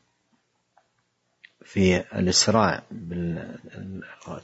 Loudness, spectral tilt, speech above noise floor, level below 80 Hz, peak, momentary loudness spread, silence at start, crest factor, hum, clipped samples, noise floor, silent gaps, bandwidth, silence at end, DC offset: -23 LUFS; -4 dB/octave; 47 dB; -58 dBFS; -6 dBFS; 20 LU; 1.7 s; 22 dB; none; under 0.1%; -72 dBFS; none; 8 kHz; 0.05 s; under 0.1%